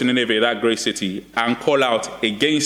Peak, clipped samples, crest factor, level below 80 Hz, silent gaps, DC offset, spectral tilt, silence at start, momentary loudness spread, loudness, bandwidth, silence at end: -4 dBFS; under 0.1%; 16 dB; -58 dBFS; none; under 0.1%; -3.5 dB/octave; 0 s; 6 LU; -19 LUFS; 16 kHz; 0 s